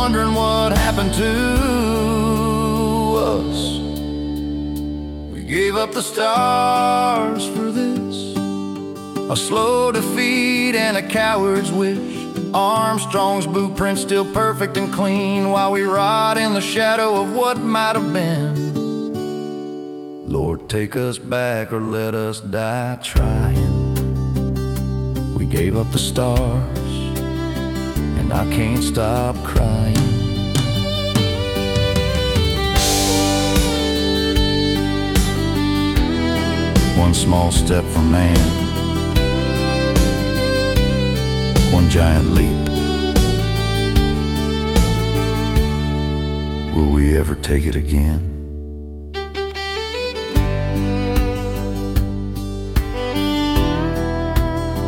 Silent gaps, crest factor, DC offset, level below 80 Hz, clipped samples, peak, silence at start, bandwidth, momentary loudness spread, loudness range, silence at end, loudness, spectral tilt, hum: none; 16 dB; under 0.1%; -26 dBFS; under 0.1%; -2 dBFS; 0 s; 18 kHz; 8 LU; 5 LU; 0 s; -19 LUFS; -5.5 dB/octave; none